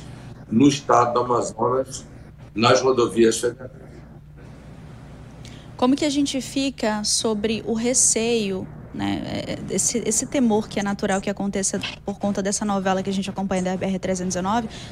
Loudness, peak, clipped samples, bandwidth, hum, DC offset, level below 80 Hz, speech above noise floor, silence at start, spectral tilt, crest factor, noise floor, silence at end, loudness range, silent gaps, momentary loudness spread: -22 LUFS; -2 dBFS; under 0.1%; 16 kHz; none; under 0.1%; -48 dBFS; 20 dB; 0 s; -4 dB/octave; 22 dB; -42 dBFS; 0 s; 4 LU; none; 22 LU